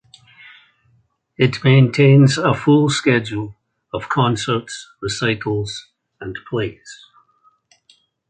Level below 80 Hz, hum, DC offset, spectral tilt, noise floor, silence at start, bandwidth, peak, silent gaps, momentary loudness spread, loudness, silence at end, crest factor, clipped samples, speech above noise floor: -52 dBFS; none; under 0.1%; -6 dB/octave; -61 dBFS; 1.4 s; 9.2 kHz; -2 dBFS; none; 20 LU; -17 LUFS; 1.35 s; 18 dB; under 0.1%; 44 dB